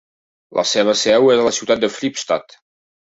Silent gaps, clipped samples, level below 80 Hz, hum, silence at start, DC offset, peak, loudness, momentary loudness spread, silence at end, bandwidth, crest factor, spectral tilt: none; under 0.1%; -58 dBFS; none; 0.5 s; under 0.1%; -2 dBFS; -16 LUFS; 10 LU; 0.65 s; 8 kHz; 16 dB; -3 dB/octave